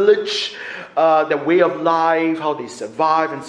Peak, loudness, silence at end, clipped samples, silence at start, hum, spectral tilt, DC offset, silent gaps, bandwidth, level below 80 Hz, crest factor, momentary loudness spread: -2 dBFS; -17 LUFS; 0 s; under 0.1%; 0 s; none; -4.5 dB/octave; under 0.1%; none; 10.5 kHz; -70 dBFS; 16 dB; 10 LU